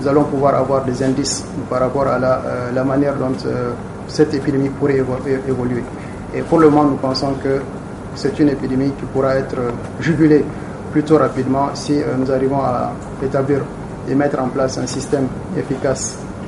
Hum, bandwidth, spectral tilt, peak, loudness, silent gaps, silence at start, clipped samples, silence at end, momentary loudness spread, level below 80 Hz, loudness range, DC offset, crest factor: none; 11.5 kHz; -6 dB/octave; 0 dBFS; -18 LUFS; none; 0 s; under 0.1%; 0 s; 10 LU; -40 dBFS; 3 LU; under 0.1%; 16 dB